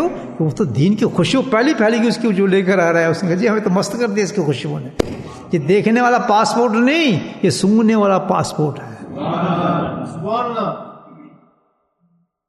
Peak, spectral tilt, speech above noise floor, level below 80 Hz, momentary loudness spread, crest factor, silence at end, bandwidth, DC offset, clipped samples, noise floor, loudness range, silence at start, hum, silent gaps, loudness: 0 dBFS; -6 dB/octave; 47 dB; -50 dBFS; 9 LU; 16 dB; 1.2 s; 12.5 kHz; under 0.1%; under 0.1%; -62 dBFS; 7 LU; 0 s; none; none; -16 LUFS